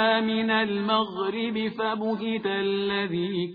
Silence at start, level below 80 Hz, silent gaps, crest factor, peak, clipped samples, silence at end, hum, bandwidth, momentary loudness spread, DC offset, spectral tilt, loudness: 0 s; -66 dBFS; none; 16 dB; -10 dBFS; under 0.1%; 0 s; none; 5 kHz; 4 LU; under 0.1%; -8 dB/octave; -26 LUFS